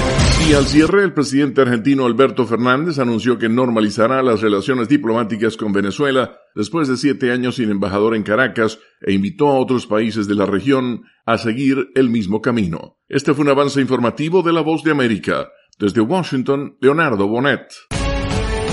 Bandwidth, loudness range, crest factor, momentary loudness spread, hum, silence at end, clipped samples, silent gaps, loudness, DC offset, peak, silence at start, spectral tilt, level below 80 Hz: 11.5 kHz; 3 LU; 16 dB; 6 LU; none; 0 s; under 0.1%; none; -17 LUFS; under 0.1%; 0 dBFS; 0 s; -6 dB/octave; -32 dBFS